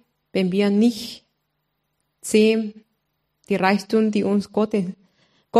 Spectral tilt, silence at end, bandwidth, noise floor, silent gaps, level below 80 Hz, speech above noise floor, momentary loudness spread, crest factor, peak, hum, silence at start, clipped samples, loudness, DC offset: -6 dB/octave; 0 s; 14.5 kHz; -74 dBFS; none; -66 dBFS; 54 dB; 15 LU; 20 dB; -2 dBFS; none; 0.35 s; under 0.1%; -21 LUFS; under 0.1%